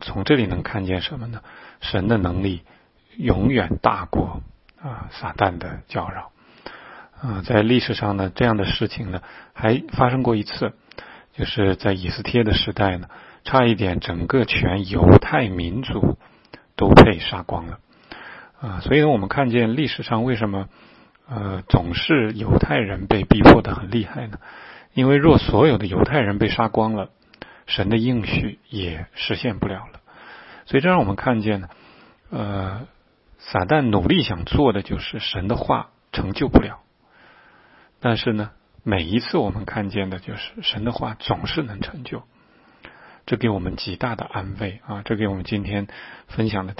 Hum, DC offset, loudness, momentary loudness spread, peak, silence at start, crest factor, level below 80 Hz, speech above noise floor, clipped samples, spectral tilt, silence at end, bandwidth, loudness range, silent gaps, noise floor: none; under 0.1%; -20 LUFS; 18 LU; 0 dBFS; 0 s; 20 dB; -36 dBFS; 35 dB; under 0.1%; -8.5 dB/octave; 0.05 s; 7.8 kHz; 9 LU; none; -54 dBFS